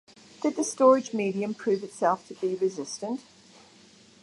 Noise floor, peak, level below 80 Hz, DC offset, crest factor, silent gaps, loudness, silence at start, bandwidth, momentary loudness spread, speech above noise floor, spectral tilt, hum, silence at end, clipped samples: -55 dBFS; -8 dBFS; -76 dBFS; under 0.1%; 20 dB; none; -27 LUFS; 0.4 s; 11.5 kHz; 13 LU; 29 dB; -5 dB/octave; none; 1.05 s; under 0.1%